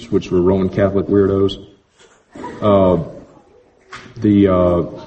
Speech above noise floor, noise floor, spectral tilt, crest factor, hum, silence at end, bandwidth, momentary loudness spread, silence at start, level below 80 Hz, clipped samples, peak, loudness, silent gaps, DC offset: 37 dB; -51 dBFS; -8.5 dB/octave; 16 dB; none; 0 s; 8.4 kHz; 19 LU; 0 s; -42 dBFS; under 0.1%; 0 dBFS; -15 LUFS; none; under 0.1%